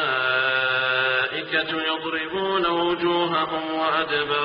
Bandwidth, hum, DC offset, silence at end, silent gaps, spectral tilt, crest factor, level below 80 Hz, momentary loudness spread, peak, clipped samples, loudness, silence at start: 5.4 kHz; none; under 0.1%; 0 s; none; -0.5 dB/octave; 14 dB; -60 dBFS; 4 LU; -8 dBFS; under 0.1%; -22 LUFS; 0 s